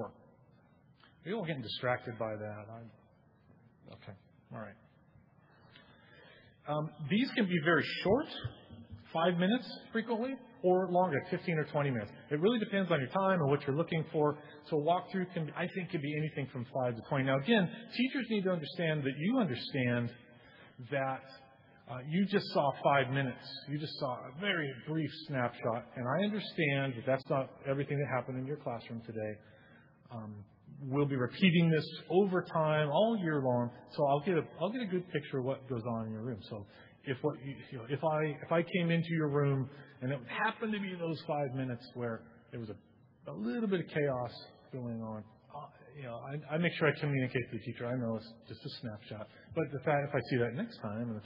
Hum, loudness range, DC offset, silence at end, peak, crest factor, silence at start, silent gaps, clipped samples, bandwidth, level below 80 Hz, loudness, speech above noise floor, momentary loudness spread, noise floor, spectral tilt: none; 8 LU; under 0.1%; 0 s; -14 dBFS; 20 dB; 0 s; none; under 0.1%; 5.6 kHz; -74 dBFS; -34 LUFS; 30 dB; 17 LU; -65 dBFS; -5 dB/octave